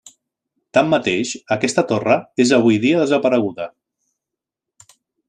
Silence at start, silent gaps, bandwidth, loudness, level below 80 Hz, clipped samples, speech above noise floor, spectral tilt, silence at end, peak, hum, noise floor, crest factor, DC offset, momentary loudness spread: 0.75 s; none; 10 kHz; -17 LUFS; -62 dBFS; under 0.1%; 68 dB; -5 dB/octave; 1.6 s; -2 dBFS; none; -85 dBFS; 18 dB; under 0.1%; 8 LU